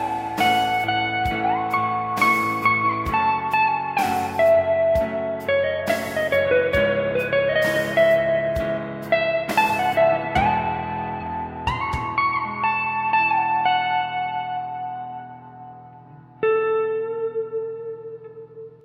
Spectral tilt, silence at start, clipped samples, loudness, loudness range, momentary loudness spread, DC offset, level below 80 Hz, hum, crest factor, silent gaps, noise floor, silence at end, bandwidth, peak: -5 dB/octave; 0 s; under 0.1%; -21 LUFS; 6 LU; 12 LU; under 0.1%; -44 dBFS; none; 16 dB; none; -45 dBFS; 0.1 s; 16 kHz; -6 dBFS